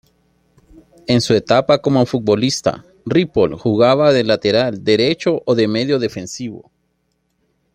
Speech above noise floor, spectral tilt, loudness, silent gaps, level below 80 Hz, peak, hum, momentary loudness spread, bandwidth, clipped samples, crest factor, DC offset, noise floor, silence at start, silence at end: 51 dB; -5.5 dB/octave; -16 LUFS; none; -52 dBFS; 0 dBFS; none; 11 LU; 15 kHz; under 0.1%; 16 dB; under 0.1%; -67 dBFS; 1.1 s; 1.15 s